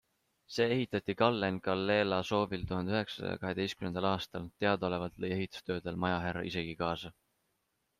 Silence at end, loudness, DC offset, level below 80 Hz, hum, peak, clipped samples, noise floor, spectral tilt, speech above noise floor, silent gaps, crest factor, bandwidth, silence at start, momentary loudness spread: 0.9 s; -34 LUFS; under 0.1%; -62 dBFS; none; -10 dBFS; under 0.1%; -80 dBFS; -6 dB/octave; 47 dB; none; 24 dB; 14 kHz; 0.5 s; 8 LU